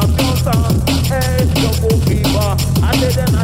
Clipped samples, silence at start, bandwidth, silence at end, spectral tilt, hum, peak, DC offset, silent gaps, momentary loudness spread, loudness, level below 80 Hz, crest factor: under 0.1%; 0 s; 16.5 kHz; 0 s; -5.5 dB/octave; none; 0 dBFS; under 0.1%; none; 1 LU; -14 LUFS; -22 dBFS; 12 dB